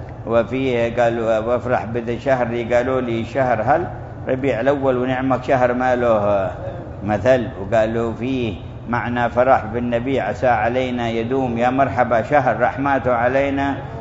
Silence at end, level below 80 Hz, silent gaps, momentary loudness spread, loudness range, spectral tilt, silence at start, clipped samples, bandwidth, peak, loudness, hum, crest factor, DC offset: 0 s; -42 dBFS; none; 7 LU; 2 LU; -7.5 dB/octave; 0 s; under 0.1%; 7.8 kHz; 0 dBFS; -19 LUFS; none; 18 dB; under 0.1%